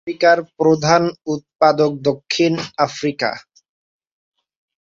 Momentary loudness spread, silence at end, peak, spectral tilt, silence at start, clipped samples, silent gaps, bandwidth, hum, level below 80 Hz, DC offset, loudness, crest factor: 9 LU; 1.45 s; -2 dBFS; -5 dB/octave; 0.05 s; under 0.1%; 1.55-1.59 s; 7.8 kHz; none; -60 dBFS; under 0.1%; -17 LUFS; 18 dB